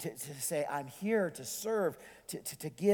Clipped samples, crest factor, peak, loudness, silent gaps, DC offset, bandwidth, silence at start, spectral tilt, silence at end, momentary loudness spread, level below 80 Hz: under 0.1%; 20 dB; -16 dBFS; -36 LUFS; none; under 0.1%; 19.5 kHz; 0 s; -4.5 dB/octave; 0 s; 9 LU; -74 dBFS